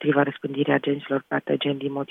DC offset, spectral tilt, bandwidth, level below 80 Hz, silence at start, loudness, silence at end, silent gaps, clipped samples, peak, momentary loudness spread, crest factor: under 0.1%; -8.5 dB/octave; 3.9 kHz; -72 dBFS; 0 s; -25 LUFS; 0.05 s; none; under 0.1%; -6 dBFS; 4 LU; 18 dB